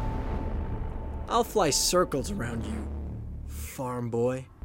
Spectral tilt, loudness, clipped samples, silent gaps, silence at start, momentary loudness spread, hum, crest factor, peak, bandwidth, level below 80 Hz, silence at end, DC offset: -4 dB/octave; -29 LUFS; under 0.1%; none; 0 s; 15 LU; none; 18 dB; -12 dBFS; 16.5 kHz; -36 dBFS; 0.05 s; under 0.1%